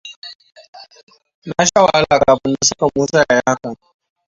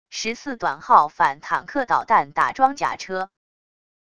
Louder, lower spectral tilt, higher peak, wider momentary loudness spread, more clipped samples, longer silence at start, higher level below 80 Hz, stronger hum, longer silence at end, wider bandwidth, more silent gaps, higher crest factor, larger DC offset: first, -14 LUFS vs -21 LUFS; about the same, -3 dB/octave vs -3 dB/octave; about the same, 0 dBFS vs 0 dBFS; first, 22 LU vs 11 LU; neither; about the same, 0.05 s vs 0.1 s; first, -48 dBFS vs -60 dBFS; neither; second, 0.55 s vs 0.75 s; second, 7.8 kHz vs 11 kHz; first, 0.16-0.22 s, 0.35-0.39 s, 0.68-0.73 s, 1.03-1.07 s, 1.34-1.42 s vs none; second, 16 dB vs 22 dB; second, under 0.1% vs 0.4%